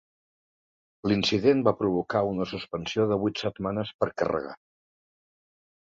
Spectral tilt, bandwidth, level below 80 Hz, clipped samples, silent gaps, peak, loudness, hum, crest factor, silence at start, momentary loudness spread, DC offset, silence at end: -6 dB/octave; 7.8 kHz; -58 dBFS; under 0.1%; 3.94-3.99 s; -8 dBFS; -27 LUFS; none; 20 dB; 1.05 s; 10 LU; under 0.1%; 1.3 s